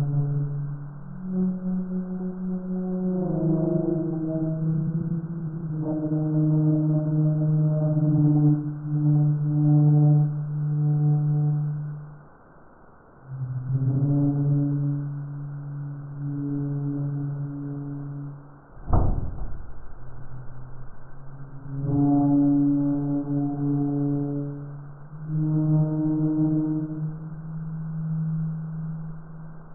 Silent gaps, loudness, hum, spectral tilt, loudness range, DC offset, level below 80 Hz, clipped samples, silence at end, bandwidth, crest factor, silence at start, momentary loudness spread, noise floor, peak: none; -25 LUFS; none; -12 dB/octave; 10 LU; under 0.1%; -42 dBFS; under 0.1%; 0 s; 1.7 kHz; 18 dB; 0 s; 19 LU; -50 dBFS; -6 dBFS